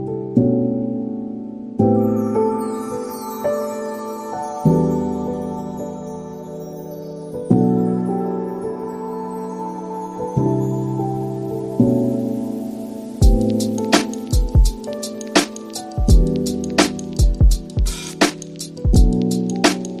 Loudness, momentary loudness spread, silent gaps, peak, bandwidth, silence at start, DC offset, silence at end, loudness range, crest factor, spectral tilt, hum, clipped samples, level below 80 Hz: -20 LUFS; 13 LU; none; 0 dBFS; 15 kHz; 0 s; under 0.1%; 0 s; 4 LU; 18 dB; -6 dB/octave; none; under 0.1%; -24 dBFS